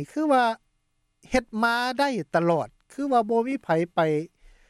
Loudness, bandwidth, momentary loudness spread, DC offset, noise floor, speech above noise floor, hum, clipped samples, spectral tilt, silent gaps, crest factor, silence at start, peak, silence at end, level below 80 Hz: -25 LUFS; 14 kHz; 8 LU; under 0.1%; -72 dBFS; 48 dB; none; under 0.1%; -6 dB/octave; none; 16 dB; 0 s; -8 dBFS; 0.45 s; -54 dBFS